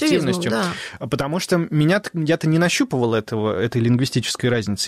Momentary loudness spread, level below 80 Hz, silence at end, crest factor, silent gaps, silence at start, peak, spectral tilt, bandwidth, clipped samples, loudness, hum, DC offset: 5 LU; -52 dBFS; 0 s; 12 dB; none; 0 s; -8 dBFS; -5.5 dB/octave; 15 kHz; under 0.1%; -20 LUFS; none; under 0.1%